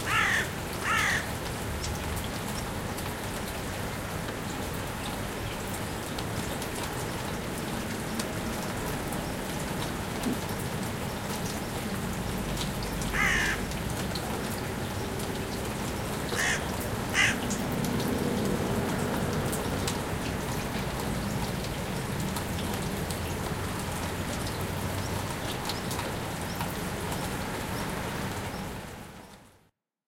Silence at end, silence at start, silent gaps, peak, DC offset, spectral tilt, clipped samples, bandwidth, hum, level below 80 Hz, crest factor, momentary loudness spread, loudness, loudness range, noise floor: 0.6 s; 0 s; none; -10 dBFS; under 0.1%; -4 dB/octave; under 0.1%; 17 kHz; none; -44 dBFS; 20 dB; 7 LU; -31 LUFS; 5 LU; -68 dBFS